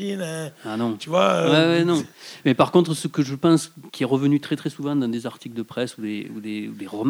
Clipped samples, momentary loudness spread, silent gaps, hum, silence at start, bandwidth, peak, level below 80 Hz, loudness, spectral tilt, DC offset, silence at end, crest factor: under 0.1%; 14 LU; none; none; 0 s; 16 kHz; -2 dBFS; -70 dBFS; -22 LUFS; -6 dB/octave; under 0.1%; 0 s; 20 dB